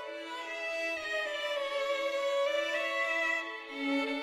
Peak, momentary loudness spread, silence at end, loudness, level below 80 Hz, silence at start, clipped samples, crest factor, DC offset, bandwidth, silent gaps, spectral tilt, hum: -20 dBFS; 7 LU; 0 s; -33 LUFS; -74 dBFS; 0 s; under 0.1%; 14 dB; under 0.1%; 15 kHz; none; -1 dB/octave; none